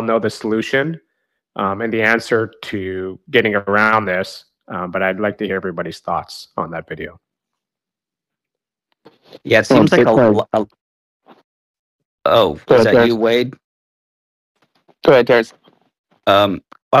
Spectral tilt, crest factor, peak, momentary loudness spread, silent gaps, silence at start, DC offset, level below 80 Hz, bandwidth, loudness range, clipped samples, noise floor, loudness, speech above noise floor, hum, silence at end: -6 dB/octave; 18 dB; 0 dBFS; 17 LU; 10.81-11.20 s, 11.44-11.99 s, 12.05-12.18 s, 13.64-14.55 s, 15.99-16.04 s, 16.82-16.91 s; 0 s; under 0.1%; -52 dBFS; 15 kHz; 9 LU; under 0.1%; -87 dBFS; -16 LUFS; 71 dB; none; 0 s